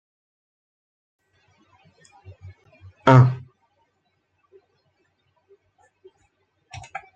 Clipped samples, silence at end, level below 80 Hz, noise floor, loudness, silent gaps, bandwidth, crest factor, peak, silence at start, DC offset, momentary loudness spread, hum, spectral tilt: under 0.1%; 3.8 s; -64 dBFS; -71 dBFS; -17 LUFS; none; 7.4 kHz; 24 dB; -2 dBFS; 3.05 s; under 0.1%; 29 LU; none; -8 dB/octave